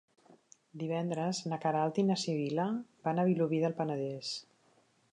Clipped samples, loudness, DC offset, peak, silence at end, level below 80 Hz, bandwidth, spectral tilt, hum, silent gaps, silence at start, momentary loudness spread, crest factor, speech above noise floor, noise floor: under 0.1%; -33 LUFS; under 0.1%; -18 dBFS; 0.7 s; -82 dBFS; 10.5 kHz; -6 dB/octave; none; none; 0.75 s; 9 LU; 16 dB; 36 dB; -69 dBFS